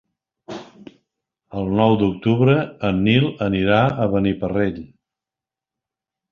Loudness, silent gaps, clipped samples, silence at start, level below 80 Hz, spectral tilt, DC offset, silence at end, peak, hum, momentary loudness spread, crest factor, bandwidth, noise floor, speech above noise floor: -19 LUFS; none; under 0.1%; 0.5 s; -46 dBFS; -8.5 dB/octave; under 0.1%; 1.45 s; -2 dBFS; none; 19 LU; 18 dB; 6.8 kHz; -88 dBFS; 70 dB